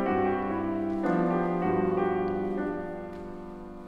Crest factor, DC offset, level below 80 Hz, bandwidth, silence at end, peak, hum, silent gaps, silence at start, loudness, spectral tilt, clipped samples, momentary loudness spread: 14 dB; under 0.1%; -52 dBFS; 5.8 kHz; 0 s; -14 dBFS; none; none; 0 s; -29 LUFS; -9.5 dB/octave; under 0.1%; 14 LU